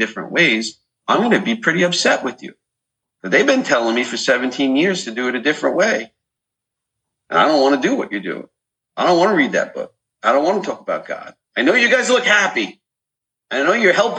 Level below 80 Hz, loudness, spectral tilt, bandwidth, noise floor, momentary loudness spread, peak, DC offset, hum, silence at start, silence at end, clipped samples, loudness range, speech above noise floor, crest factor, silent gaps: -72 dBFS; -16 LUFS; -3.5 dB/octave; 9.6 kHz; -84 dBFS; 14 LU; -2 dBFS; under 0.1%; none; 0 s; 0 s; under 0.1%; 2 LU; 67 dB; 16 dB; none